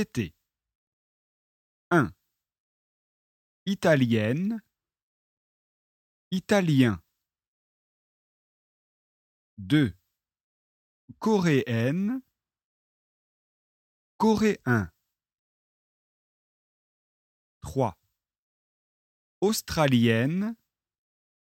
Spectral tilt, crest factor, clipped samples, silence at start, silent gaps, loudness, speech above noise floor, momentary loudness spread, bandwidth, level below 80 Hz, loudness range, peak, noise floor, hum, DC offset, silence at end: -6 dB/octave; 22 dB; under 0.1%; 0 s; 0.75-1.91 s, 2.60-3.66 s, 5.03-6.31 s, 7.47-9.57 s, 10.43-11.08 s, 12.64-14.19 s, 15.39-17.61 s, 18.38-19.41 s; -26 LUFS; over 66 dB; 14 LU; 16.5 kHz; -60 dBFS; 8 LU; -8 dBFS; under -90 dBFS; none; under 0.1%; 1 s